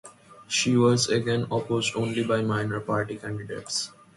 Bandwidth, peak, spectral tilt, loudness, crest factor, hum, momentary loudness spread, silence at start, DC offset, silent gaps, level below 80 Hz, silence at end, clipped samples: 11.5 kHz; -10 dBFS; -4.5 dB/octave; -26 LUFS; 18 dB; none; 10 LU; 0.05 s; under 0.1%; none; -60 dBFS; 0.25 s; under 0.1%